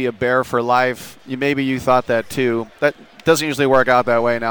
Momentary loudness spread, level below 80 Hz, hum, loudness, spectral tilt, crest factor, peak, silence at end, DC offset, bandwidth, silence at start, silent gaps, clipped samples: 6 LU; -50 dBFS; none; -17 LUFS; -5 dB/octave; 16 dB; -2 dBFS; 0 s; under 0.1%; 19 kHz; 0 s; none; under 0.1%